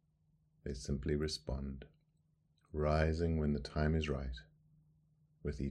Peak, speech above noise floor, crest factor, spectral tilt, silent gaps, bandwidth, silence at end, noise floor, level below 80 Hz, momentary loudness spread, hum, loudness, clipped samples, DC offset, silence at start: -18 dBFS; 39 dB; 22 dB; -6.5 dB/octave; none; 11 kHz; 0 s; -75 dBFS; -46 dBFS; 14 LU; none; -38 LUFS; under 0.1%; under 0.1%; 0.65 s